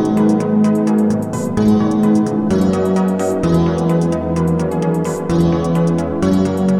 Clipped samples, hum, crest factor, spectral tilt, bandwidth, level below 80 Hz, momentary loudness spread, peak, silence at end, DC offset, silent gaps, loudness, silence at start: under 0.1%; none; 12 dB; -8 dB/octave; 13.5 kHz; -38 dBFS; 4 LU; -2 dBFS; 0 s; 0.4%; none; -15 LUFS; 0 s